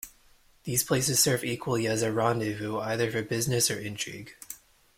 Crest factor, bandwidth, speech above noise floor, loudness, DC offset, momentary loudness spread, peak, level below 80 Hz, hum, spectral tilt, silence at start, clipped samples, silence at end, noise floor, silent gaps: 20 dB; 16.5 kHz; 32 dB; -27 LUFS; under 0.1%; 19 LU; -10 dBFS; -60 dBFS; none; -3.5 dB/octave; 0.05 s; under 0.1%; 0.4 s; -60 dBFS; none